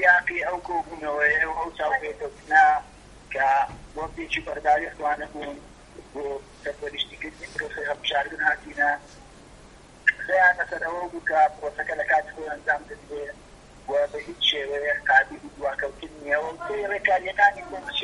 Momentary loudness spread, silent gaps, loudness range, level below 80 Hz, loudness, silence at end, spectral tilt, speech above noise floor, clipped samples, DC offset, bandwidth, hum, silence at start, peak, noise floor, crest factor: 16 LU; none; 6 LU; -52 dBFS; -24 LUFS; 0 s; -3 dB/octave; 23 dB; under 0.1%; under 0.1%; 11.5 kHz; none; 0 s; -4 dBFS; -49 dBFS; 22 dB